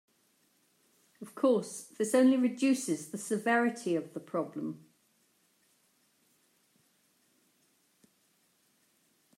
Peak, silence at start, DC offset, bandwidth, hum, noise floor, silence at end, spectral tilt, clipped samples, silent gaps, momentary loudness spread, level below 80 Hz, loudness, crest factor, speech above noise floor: -14 dBFS; 1.2 s; under 0.1%; 15.5 kHz; none; -72 dBFS; 4.6 s; -4.5 dB/octave; under 0.1%; none; 16 LU; -90 dBFS; -31 LUFS; 20 dB; 42 dB